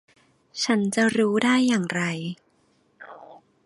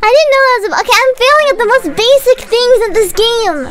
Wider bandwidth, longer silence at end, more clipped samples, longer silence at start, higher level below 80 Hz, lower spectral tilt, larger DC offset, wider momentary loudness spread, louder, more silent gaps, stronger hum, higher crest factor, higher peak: second, 11.5 kHz vs 16.5 kHz; first, 0.3 s vs 0 s; neither; first, 0.55 s vs 0 s; second, -68 dBFS vs -34 dBFS; first, -4.5 dB/octave vs -1.5 dB/octave; neither; first, 21 LU vs 3 LU; second, -23 LUFS vs -9 LUFS; neither; neither; first, 20 dB vs 10 dB; second, -6 dBFS vs 0 dBFS